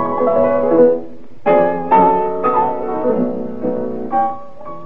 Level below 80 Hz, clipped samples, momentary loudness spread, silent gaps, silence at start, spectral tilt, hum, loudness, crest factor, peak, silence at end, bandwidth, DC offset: -58 dBFS; under 0.1%; 10 LU; none; 0 s; -9.5 dB/octave; none; -16 LUFS; 16 dB; 0 dBFS; 0 s; 4.2 kHz; 4%